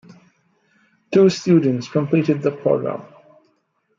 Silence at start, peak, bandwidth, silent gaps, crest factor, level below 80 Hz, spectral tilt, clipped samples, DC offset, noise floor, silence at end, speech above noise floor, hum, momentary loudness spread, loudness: 1.1 s; -4 dBFS; 7.6 kHz; none; 16 dB; -66 dBFS; -7 dB/octave; under 0.1%; under 0.1%; -66 dBFS; 0.95 s; 49 dB; none; 7 LU; -18 LUFS